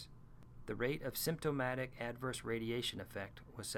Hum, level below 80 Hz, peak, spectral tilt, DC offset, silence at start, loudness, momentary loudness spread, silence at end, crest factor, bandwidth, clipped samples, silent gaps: none; -60 dBFS; -24 dBFS; -4.5 dB/octave; under 0.1%; 0 s; -41 LUFS; 12 LU; 0 s; 18 dB; 17.5 kHz; under 0.1%; none